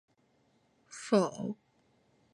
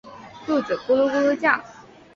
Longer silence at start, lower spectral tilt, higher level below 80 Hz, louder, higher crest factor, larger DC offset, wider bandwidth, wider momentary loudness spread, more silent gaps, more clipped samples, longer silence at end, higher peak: first, 0.9 s vs 0.05 s; about the same, -5.5 dB/octave vs -5 dB/octave; second, -80 dBFS vs -62 dBFS; second, -32 LUFS vs -21 LUFS; about the same, 22 dB vs 20 dB; neither; first, 11.5 kHz vs 7.2 kHz; first, 19 LU vs 12 LU; neither; neither; first, 0.8 s vs 0.35 s; second, -14 dBFS vs -4 dBFS